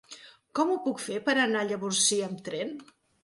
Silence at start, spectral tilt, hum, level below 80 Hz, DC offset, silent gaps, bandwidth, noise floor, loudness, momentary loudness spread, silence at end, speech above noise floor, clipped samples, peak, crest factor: 0.1 s; -2.5 dB/octave; none; -76 dBFS; under 0.1%; none; 11.5 kHz; -51 dBFS; -28 LUFS; 16 LU; 0.4 s; 23 dB; under 0.1%; -12 dBFS; 18 dB